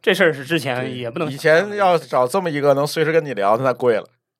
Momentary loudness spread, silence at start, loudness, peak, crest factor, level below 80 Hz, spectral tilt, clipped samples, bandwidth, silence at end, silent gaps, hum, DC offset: 8 LU; 0.05 s; -18 LUFS; -2 dBFS; 16 dB; -72 dBFS; -5 dB/octave; under 0.1%; 16 kHz; 0.35 s; none; none; under 0.1%